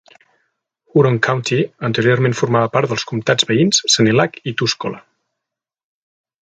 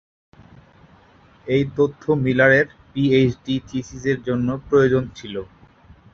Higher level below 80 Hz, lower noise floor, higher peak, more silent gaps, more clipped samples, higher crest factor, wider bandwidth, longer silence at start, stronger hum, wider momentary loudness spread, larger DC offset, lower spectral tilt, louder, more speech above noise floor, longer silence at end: second, -58 dBFS vs -50 dBFS; first, -83 dBFS vs -51 dBFS; about the same, 0 dBFS vs -2 dBFS; neither; neither; about the same, 18 dB vs 18 dB; first, 9.6 kHz vs 7 kHz; second, 0.95 s vs 1.45 s; neither; second, 7 LU vs 15 LU; neither; second, -4.5 dB/octave vs -7 dB/octave; first, -16 LUFS vs -20 LUFS; first, 68 dB vs 32 dB; first, 1.55 s vs 0.7 s